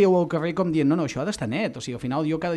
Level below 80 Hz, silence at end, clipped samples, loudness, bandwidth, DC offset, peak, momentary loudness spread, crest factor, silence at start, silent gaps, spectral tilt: -56 dBFS; 0 s; under 0.1%; -25 LUFS; 12 kHz; under 0.1%; -8 dBFS; 6 LU; 16 dB; 0 s; none; -6.5 dB/octave